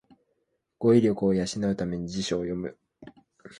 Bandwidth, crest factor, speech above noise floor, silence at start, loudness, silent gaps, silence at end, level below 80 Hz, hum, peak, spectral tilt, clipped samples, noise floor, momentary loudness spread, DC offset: 11.5 kHz; 20 dB; 51 dB; 0.8 s; -26 LUFS; none; 0.05 s; -56 dBFS; none; -8 dBFS; -6.5 dB/octave; under 0.1%; -76 dBFS; 11 LU; under 0.1%